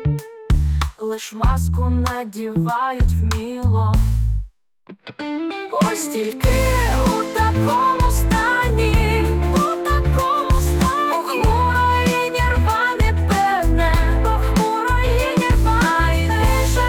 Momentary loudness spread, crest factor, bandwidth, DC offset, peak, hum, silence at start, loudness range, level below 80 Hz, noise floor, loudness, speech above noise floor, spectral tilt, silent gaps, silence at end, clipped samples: 7 LU; 10 dB; 18.5 kHz; under 0.1%; -6 dBFS; none; 0 s; 4 LU; -22 dBFS; -45 dBFS; -18 LUFS; 27 dB; -5.5 dB/octave; none; 0 s; under 0.1%